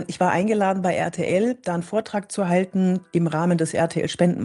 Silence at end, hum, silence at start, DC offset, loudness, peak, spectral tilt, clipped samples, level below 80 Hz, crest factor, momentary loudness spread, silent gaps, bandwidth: 0 s; none; 0 s; under 0.1%; -22 LUFS; -6 dBFS; -6.5 dB/octave; under 0.1%; -64 dBFS; 16 dB; 5 LU; none; 11.5 kHz